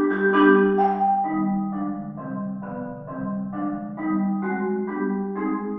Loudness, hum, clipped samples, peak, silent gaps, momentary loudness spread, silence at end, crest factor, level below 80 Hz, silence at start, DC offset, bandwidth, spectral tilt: -24 LUFS; none; under 0.1%; -4 dBFS; none; 15 LU; 0 s; 18 dB; -58 dBFS; 0 s; under 0.1%; 3.7 kHz; -10.5 dB/octave